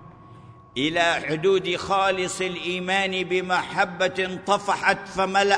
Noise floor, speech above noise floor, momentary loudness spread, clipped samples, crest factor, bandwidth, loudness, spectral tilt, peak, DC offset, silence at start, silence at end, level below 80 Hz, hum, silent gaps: -46 dBFS; 23 dB; 5 LU; under 0.1%; 20 dB; 10.5 kHz; -23 LUFS; -3.5 dB/octave; -4 dBFS; under 0.1%; 0 s; 0 s; -58 dBFS; none; none